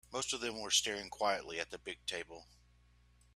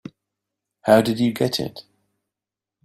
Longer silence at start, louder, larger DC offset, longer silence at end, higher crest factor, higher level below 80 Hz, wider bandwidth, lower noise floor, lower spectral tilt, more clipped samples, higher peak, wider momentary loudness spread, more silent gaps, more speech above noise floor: second, 0.1 s vs 0.85 s; second, -37 LUFS vs -20 LUFS; neither; second, 0.9 s vs 1.05 s; about the same, 24 dB vs 22 dB; second, -66 dBFS vs -58 dBFS; about the same, 15 kHz vs 15.5 kHz; second, -67 dBFS vs -88 dBFS; second, -0.5 dB/octave vs -5.5 dB/octave; neither; second, -16 dBFS vs -2 dBFS; about the same, 12 LU vs 12 LU; neither; second, 28 dB vs 69 dB